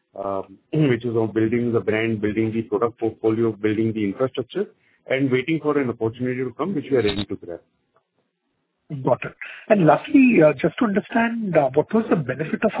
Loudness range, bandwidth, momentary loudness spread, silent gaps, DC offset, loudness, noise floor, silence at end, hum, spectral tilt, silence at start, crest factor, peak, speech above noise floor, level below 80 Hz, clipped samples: 7 LU; 4 kHz; 12 LU; none; under 0.1%; -21 LUFS; -73 dBFS; 0 s; none; -11 dB/octave; 0.15 s; 20 dB; -2 dBFS; 53 dB; -54 dBFS; under 0.1%